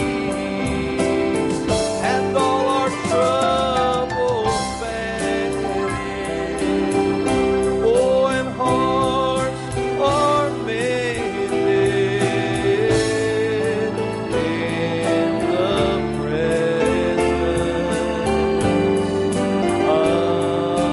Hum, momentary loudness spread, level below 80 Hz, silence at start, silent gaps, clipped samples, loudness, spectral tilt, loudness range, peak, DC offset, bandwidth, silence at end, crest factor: none; 5 LU; -40 dBFS; 0 s; none; under 0.1%; -20 LUFS; -5.5 dB/octave; 2 LU; -6 dBFS; under 0.1%; 11.5 kHz; 0 s; 14 dB